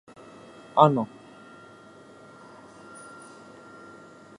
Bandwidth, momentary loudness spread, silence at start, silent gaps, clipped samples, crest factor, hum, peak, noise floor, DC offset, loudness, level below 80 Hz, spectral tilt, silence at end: 11 kHz; 29 LU; 0.75 s; none; under 0.1%; 28 dB; none; -2 dBFS; -50 dBFS; under 0.1%; -23 LUFS; -74 dBFS; -7.5 dB/octave; 3.35 s